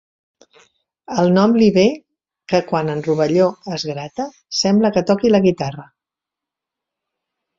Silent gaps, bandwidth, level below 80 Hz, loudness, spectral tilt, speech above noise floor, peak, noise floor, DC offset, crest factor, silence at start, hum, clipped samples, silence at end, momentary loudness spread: none; 7.6 kHz; -56 dBFS; -17 LUFS; -6 dB/octave; 70 dB; -2 dBFS; -86 dBFS; under 0.1%; 16 dB; 1.1 s; none; under 0.1%; 1.75 s; 13 LU